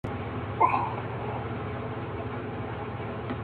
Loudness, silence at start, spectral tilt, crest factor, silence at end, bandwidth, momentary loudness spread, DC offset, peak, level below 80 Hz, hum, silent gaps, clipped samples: -31 LUFS; 0.05 s; -9 dB/octave; 22 dB; 0 s; 4.7 kHz; 10 LU; under 0.1%; -10 dBFS; -52 dBFS; none; none; under 0.1%